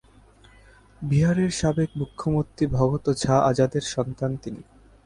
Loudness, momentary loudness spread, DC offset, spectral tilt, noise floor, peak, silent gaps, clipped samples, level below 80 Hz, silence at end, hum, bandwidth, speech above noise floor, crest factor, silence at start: -24 LUFS; 10 LU; under 0.1%; -6.5 dB/octave; -53 dBFS; -6 dBFS; none; under 0.1%; -46 dBFS; 0.45 s; none; 11.5 kHz; 30 dB; 18 dB; 1 s